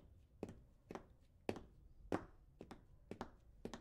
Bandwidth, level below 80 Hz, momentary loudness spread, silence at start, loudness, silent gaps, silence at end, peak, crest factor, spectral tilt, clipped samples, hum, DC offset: 15.5 kHz; -66 dBFS; 19 LU; 0 s; -53 LUFS; none; 0 s; -24 dBFS; 28 dB; -6 dB/octave; under 0.1%; none; under 0.1%